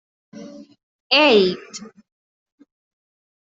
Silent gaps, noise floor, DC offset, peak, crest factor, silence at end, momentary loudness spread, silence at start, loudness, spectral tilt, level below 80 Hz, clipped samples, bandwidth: 0.83-1.10 s; -39 dBFS; under 0.1%; -2 dBFS; 20 dB; 1.55 s; 26 LU; 0.35 s; -15 LUFS; -4 dB/octave; -68 dBFS; under 0.1%; 7.8 kHz